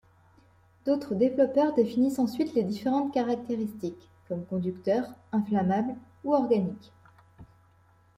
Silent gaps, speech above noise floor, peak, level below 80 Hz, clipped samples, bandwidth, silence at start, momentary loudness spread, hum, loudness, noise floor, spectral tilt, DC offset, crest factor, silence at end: none; 34 dB; -12 dBFS; -68 dBFS; under 0.1%; 15.5 kHz; 0.85 s; 11 LU; none; -28 LUFS; -62 dBFS; -8 dB/octave; under 0.1%; 16 dB; 0.75 s